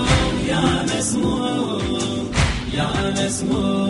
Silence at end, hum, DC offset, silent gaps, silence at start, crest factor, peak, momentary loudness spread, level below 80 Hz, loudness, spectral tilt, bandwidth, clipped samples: 0 s; none; under 0.1%; none; 0 s; 16 dB; -4 dBFS; 4 LU; -30 dBFS; -20 LUFS; -4.5 dB/octave; 11.5 kHz; under 0.1%